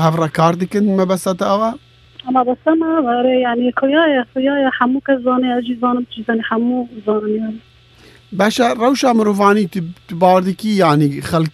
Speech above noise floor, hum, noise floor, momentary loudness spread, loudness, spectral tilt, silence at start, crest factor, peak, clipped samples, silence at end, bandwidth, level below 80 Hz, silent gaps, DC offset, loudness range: 30 dB; none; -45 dBFS; 8 LU; -15 LUFS; -6 dB/octave; 0 s; 16 dB; 0 dBFS; under 0.1%; 0.05 s; 14 kHz; -54 dBFS; none; under 0.1%; 4 LU